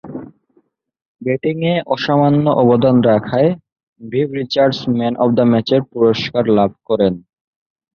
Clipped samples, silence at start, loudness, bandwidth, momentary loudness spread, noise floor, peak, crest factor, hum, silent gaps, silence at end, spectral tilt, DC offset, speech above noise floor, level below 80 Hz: under 0.1%; 0.05 s; -15 LUFS; 6.8 kHz; 9 LU; -59 dBFS; -2 dBFS; 14 dB; none; 1.08-1.15 s, 3.72-3.76 s, 3.83-3.93 s; 0.75 s; -8 dB/octave; under 0.1%; 45 dB; -52 dBFS